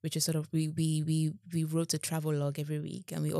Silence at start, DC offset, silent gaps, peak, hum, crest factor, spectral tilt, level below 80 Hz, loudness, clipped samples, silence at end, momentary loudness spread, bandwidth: 0.05 s; under 0.1%; none; -16 dBFS; none; 16 dB; -5.5 dB/octave; -86 dBFS; -33 LUFS; under 0.1%; 0 s; 6 LU; 16 kHz